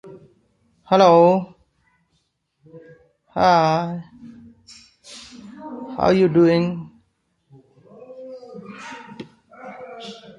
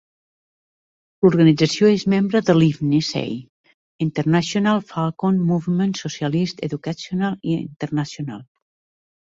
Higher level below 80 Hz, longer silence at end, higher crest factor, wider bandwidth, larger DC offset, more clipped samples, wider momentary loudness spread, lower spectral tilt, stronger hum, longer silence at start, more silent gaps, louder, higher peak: about the same, -56 dBFS vs -58 dBFS; second, 0.25 s vs 0.75 s; about the same, 20 dB vs 18 dB; first, 10.5 kHz vs 7.8 kHz; neither; neither; first, 25 LU vs 11 LU; about the same, -7 dB/octave vs -6.5 dB/octave; neither; second, 0.05 s vs 1.2 s; second, none vs 3.49-3.64 s, 3.74-3.99 s; first, -17 LUFS vs -20 LUFS; about the same, -2 dBFS vs -2 dBFS